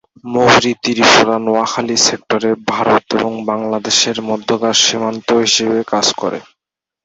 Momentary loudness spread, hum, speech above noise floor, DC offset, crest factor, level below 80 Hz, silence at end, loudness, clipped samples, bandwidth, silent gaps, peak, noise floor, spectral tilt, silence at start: 9 LU; none; 68 dB; under 0.1%; 14 dB; -54 dBFS; 0.6 s; -13 LUFS; under 0.1%; 8.2 kHz; none; 0 dBFS; -82 dBFS; -2.5 dB/octave; 0.25 s